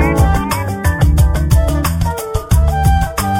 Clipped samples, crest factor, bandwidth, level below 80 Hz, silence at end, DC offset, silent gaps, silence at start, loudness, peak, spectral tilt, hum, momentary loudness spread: under 0.1%; 12 dB; 17 kHz; -16 dBFS; 0 s; under 0.1%; none; 0 s; -14 LUFS; 0 dBFS; -6 dB/octave; none; 6 LU